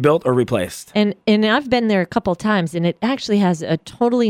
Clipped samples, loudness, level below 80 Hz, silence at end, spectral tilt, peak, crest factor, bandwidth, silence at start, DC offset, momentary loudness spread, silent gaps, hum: under 0.1%; -18 LUFS; -50 dBFS; 0 s; -6 dB/octave; -2 dBFS; 16 dB; 15 kHz; 0 s; under 0.1%; 6 LU; none; none